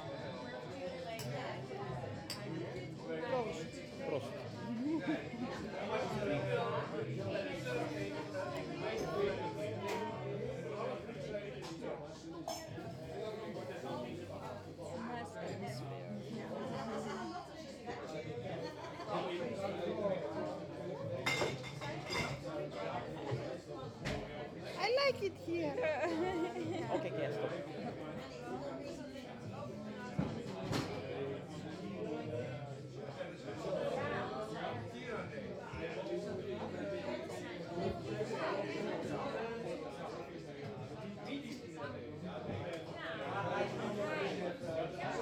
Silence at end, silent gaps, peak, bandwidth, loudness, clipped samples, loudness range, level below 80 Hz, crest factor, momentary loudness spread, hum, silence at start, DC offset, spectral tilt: 0 s; none; -20 dBFS; 19 kHz; -42 LUFS; under 0.1%; 6 LU; -66 dBFS; 20 dB; 9 LU; none; 0 s; under 0.1%; -5.5 dB/octave